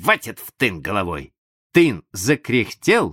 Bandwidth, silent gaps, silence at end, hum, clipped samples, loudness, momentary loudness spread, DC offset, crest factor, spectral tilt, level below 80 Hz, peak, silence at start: 17 kHz; 1.38-1.70 s; 0 s; none; under 0.1%; -20 LUFS; 9 LU; under 0.1%; 20 dB; -4.5 dB/octave; -50 dBFS; 0 dBFS; 0 s